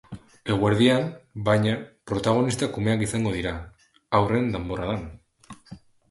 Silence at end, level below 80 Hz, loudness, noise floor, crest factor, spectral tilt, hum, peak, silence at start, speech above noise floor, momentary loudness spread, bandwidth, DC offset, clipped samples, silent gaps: 0.35 s; -46 dBFS; -24 LUFS; -48 dBFS; 20 dB; -6 dB/octave; none; -6 dBFS; 0.1 s; 25 dB; 16 LU; 11.5 kHz; under 0.1%; under 0.1%; none